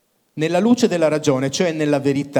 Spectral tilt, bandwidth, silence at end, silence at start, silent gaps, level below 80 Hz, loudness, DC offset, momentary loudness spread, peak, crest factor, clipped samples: -5.5 dB/octave; 17.5 kHz; 0 s; 0.35 s; none; -62 dBFS; -18 LUFS; under 0.1%; 5 LU; -4 dBFS; 14 dB; under 0.1%